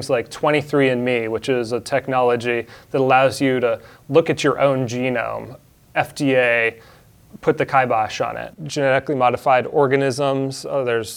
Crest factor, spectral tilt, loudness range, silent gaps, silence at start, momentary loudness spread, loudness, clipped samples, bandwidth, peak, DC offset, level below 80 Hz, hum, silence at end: 18 dB; -5.5 dB/octave; 2 LU; none; 0 s; 9 LU; -19 LUFS; under 0.1%; 18 kHz; -2 dBFS; under 0.1%; -56 dBFS; none; 0 s